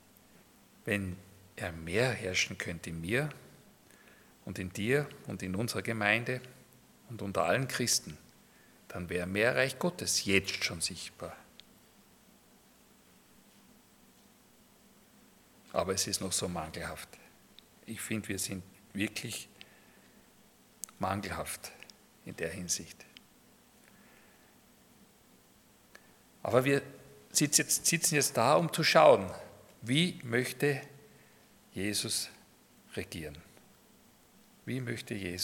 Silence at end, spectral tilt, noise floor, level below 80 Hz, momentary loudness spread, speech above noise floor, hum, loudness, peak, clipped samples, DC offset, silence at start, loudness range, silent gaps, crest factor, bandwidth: 0 s; -3.5 dB/octave; -63 dBFS; -68 dBFS; 21 LU; 31 dB; none; -32 LUFS; -8 dBFS; under 0.1%; under 0.1%; 0.85 s; 14 LU; none; 26 dB; 18 kHz